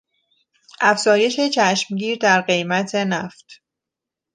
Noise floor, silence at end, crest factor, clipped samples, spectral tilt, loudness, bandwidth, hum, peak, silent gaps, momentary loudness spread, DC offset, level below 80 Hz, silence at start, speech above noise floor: -85 dBFS; 0.8 s; 18 dB; under 0.1%; -3.5 dB/octave; -18 LUFS; 10 kHz; none; -2 dBFS; none; 7 LU; under 0.1%; -72 dBFS; 0.8 s; 67 dB